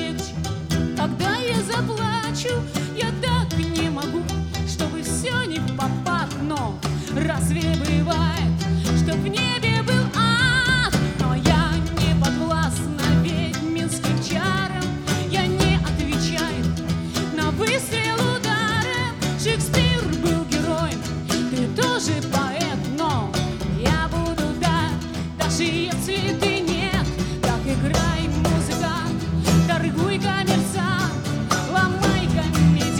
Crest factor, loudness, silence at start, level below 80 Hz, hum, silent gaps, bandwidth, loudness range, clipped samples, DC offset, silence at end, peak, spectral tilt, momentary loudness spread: 18 dB; -22 LUFS; 0 s; -34 dBFS; none; none; 17.5 kHz; 4 LU; under 0.1%; under 0.1%; 0 s; -4 dBFS; -5 dB/octave; 6 LU